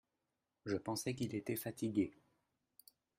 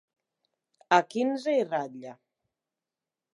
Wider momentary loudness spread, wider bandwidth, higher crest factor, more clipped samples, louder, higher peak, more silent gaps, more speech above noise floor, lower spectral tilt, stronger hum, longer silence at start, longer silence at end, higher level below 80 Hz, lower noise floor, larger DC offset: second, 5 LU vs 18 LU; first, 16 kHz vs 11.5 kHz; about the same, 20 dB vs 24 dB; neither; second, -41 LUFS vs -27 LUFS; second, -24 dBFS vs -6 dBFS; neither; second, 48 dB vs over 63 dB; about the same, -5.5 dB/octave vs -4.5 dB/octave; neither; second, 0.65 s vs 0.9 s; about the same, 1.1 s vs 1.2 s; first, -76 dBFS vs -88 dBFS; about the same, -89 dBFS vs under -90 dBFS; neither